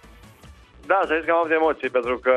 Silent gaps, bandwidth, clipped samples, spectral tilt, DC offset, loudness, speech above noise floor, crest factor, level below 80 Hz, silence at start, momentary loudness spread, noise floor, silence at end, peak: none; 9.4 kHz; under 0.1%; -5.5 dB/octave; under 0.1%; -21 LUFS; 27 dB; 18 dB; -52 dBFS; 0.45 s; 4 LU; -48 dBFS; 0 s; -6 dBFS